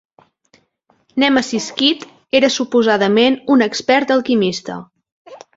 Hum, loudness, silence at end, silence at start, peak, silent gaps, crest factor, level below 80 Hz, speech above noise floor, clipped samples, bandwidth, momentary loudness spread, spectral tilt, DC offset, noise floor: none; -15 LUFS; 0.2 s; 1.15 s; 0 dBFS; 5.12-5.25 s; 16 dB; -60 dBFS; 45 dB; under 0.1%; 7.8 kHz; 12 LU; -4 dB/octave; under 0.1%; -60 dBFS